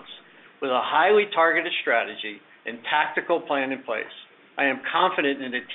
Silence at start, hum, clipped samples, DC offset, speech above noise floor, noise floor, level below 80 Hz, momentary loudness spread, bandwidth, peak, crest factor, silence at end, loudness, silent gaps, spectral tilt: 0 s; none; under 0.1%; under 0.1%; 24 dB; -47 dBFS; -76 dBFS; 16 LU; 4.2 kHz; -6 dBFS; 18 dB; 0 s; -23 LUFS; none; 0 dB/octave